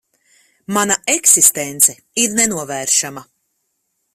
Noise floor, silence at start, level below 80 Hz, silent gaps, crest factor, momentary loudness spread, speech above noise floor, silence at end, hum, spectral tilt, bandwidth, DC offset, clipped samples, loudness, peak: -70 dBFS; 0.7 s; -60 dBFS; none; 18 dB; 11 LU; 54 dB; 0.9 s; none; -1 dB/octave; 16.5 kHz; under 0.1%; under 0.1%; -13 LUFS; 0 dBFS